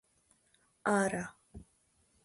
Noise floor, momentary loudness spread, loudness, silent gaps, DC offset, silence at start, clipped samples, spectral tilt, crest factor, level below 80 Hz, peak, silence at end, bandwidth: -72 dBFS; 25 LU; -34 LUFS; none; under 0.1%; 0.85 s; under 0.1%; -5 dB/octave; 20 dB; -64 dBFS; -18 dBFS; 0.65 s; 11.5 kHz